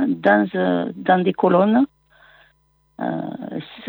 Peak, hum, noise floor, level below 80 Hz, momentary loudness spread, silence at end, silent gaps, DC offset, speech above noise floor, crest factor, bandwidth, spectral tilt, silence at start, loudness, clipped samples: -2 dBFS; none; -62 dBFS; -66 dBFS; 13 LU; 0 s; none; under 0.1%; 43 dB; 18 dB; over 20 kHz; -9.5 dB/octave; 0 s; -19 LUFS; under 0.1%